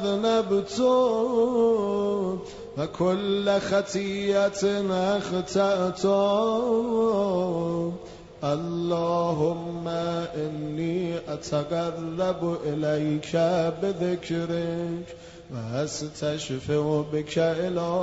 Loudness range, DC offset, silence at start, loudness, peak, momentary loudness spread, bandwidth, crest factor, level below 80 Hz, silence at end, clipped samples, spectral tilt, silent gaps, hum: 4 LU; under 0.1%; 0 s; -26 LUFS; -10 dBFS; 8 LU; 8 kHz; 14 dB; -56 dBFS; 0 s; under 0.1%; -6 dB/octave; none; none